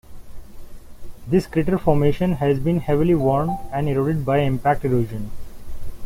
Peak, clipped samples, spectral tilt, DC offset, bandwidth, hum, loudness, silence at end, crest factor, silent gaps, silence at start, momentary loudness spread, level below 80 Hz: -4 dBFS; under 0.1%; -8.5 dB/octave; under 0.1%; 16 kHz; none; -20 LUFS; 0 s; 16 dB; none; 0.1 s; 16 LU; -36 dBFS